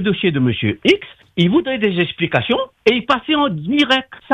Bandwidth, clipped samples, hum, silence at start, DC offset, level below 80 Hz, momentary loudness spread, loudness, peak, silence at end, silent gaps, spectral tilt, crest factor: 9.6 kHz; under 0.1%; none; 0 s; under 0.1%; -52 dBFS; 3 LU; -17 LUFS; 0 dBFS; 0 s; none; -6.5 dB/octave; 16 dB